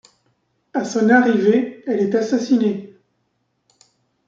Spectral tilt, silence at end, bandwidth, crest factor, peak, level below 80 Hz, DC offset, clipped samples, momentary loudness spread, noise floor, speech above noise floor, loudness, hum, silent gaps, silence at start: -6 dB/octave; 1.4 s; 7.6 kHz; 18 dB; -2 dBFS; -68 dBFS; under 0.1%; under 0.1%; 11 LU; -69 dBFS; 53 dB; -18 LUFS; none; none; 0.75 s